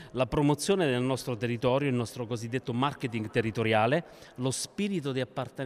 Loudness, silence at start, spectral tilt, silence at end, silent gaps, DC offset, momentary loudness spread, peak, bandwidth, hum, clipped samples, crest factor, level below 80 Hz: -29 LUFS; 0 s; -5.5 dB/octave; 0 s; none; under 0.1%; 8 LU; -12 dBFS; 15.5 kHz; none; under 0.1%; 16 dB; -56 dBFS